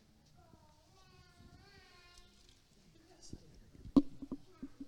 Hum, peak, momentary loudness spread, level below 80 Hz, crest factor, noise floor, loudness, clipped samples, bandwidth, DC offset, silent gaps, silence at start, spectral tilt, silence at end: none; -14 dBFS; 29 LU; -58 dBFS; 28 dB; -65 dBFS; -36 LUFS; under 0.1%; 10 kHz; under 0.1%; none; 2.15 s; -7 dB/octave; 0 s